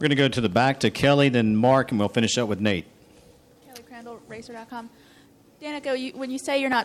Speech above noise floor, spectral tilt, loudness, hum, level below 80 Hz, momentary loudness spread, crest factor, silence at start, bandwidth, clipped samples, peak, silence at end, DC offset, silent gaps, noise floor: 32 dB; -5 dB/octave; -22 LUFS; none; -56 dBFS; 21 LU; 20 dB; 0 s; 14 kHz; under 0.1%; -4 dBFS; 0 s; under 0.1%; none; -54 dBFS